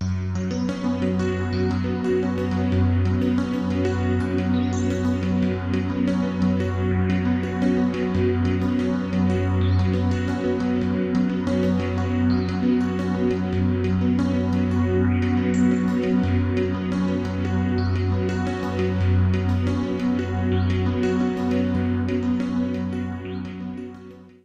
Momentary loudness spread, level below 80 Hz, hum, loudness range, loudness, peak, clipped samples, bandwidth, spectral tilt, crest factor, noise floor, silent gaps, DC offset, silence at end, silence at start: 4 LU; -44 dBFS; none; 2 LU; -23 LUFS; -10 dBFS; under 0.1%; 8 kHz; -8 dB/octave; 12 dB; -42 dBFS; none; under 0.1%; 0.15 s; 0 s